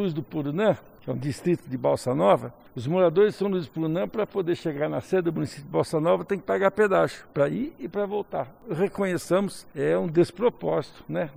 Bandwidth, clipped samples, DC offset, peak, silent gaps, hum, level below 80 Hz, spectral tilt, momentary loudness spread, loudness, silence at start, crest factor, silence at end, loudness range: 15.5 kHz; under 0.1%; under 0.1%; -8 dBFS; none; none; -60 dBFS; -7 dB/octave; 10 LU; -26 LUFS; 0 s; 18 dB; 0 s; 2 LU